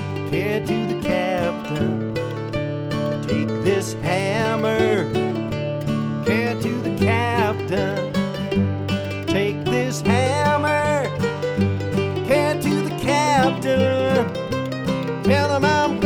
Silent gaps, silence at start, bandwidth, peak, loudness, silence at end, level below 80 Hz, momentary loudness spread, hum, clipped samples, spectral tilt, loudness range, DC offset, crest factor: none; 0 s; 19 kHz; -4 dBFS; -21 LUFS; 0 s; -48 dBFS; 6 LU; none; under 0.1%; -6 dB/octave; 3 LU; under 0.1%; 16 dB